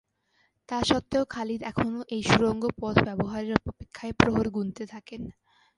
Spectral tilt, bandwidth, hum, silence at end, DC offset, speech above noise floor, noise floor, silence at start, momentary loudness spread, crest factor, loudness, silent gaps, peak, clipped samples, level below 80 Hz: -5.5 dB/octave; 11.5 kHz; none; 0.45 s; under 0.1%; 43 dB; -70 dBFS; 0.7 s; 17 LU; 28 dB; -27 LUFS; none; 0 dBFS; under 0.1%; -48 dBFS